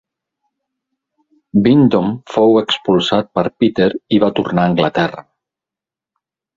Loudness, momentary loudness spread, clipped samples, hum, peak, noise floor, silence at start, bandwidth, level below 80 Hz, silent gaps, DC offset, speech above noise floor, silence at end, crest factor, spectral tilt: -14 LUFS; 7 LU; under 0.1%; none; 0 dBFS; -87 dBFS; 1.55 s; 7.6 kHz; -50 dBFS; none; under 0.1%; 74 dB; 1.35 s; 16 dB; -7 dB/octave